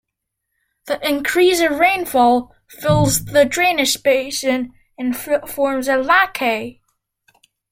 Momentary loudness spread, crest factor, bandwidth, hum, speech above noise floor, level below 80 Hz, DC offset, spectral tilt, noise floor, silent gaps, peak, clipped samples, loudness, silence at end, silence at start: 10 LU; 16 dB; 16.5 kHz; none; 61 dB; -46 dBFS; under 0.1%; -4 dB/octave; -78 dBFS; none; -2 dBFS; under 0.1%; -17 LUFS; 1 s; 0.85 s